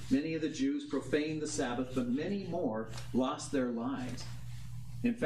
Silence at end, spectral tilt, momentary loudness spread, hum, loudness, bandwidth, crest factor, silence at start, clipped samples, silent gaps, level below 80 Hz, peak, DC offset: 0 s; -5.5 dB/octave; 11 LU; none; -35 LUFS; 13 kHz; 16 dB; 0 s; under 0.1%; none; -58 dBFS; -18 dBFS; 0.3%